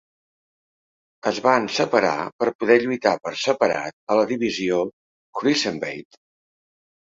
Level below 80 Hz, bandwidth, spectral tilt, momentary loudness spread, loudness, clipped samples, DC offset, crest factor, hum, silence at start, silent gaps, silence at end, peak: -64 dBFS; 7.8 kHz; -4 dB/octave; 10 LU; -22 LUFS; under 0.1%; under 0.1%; 20 dB; none; 1.25 s; 2.32-2.39 s, 2.55-2.59 s, 3.93-4.07 s, 4.93-5.33 s; 1.1 s; -2 dBFS